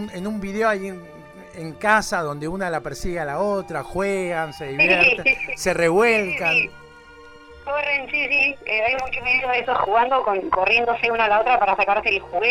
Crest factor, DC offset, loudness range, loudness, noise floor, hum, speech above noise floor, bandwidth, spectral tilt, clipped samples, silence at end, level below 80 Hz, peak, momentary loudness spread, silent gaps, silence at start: 18 dB; under 0.1%; 6 LU; -20 LUFS; -44 dBFS; none; 24 dB; 16 kHz; -4 dB/octave; under 0.1%; 0 s; -46 dBFS; -4 dBFS; 11 LU; none; 0 s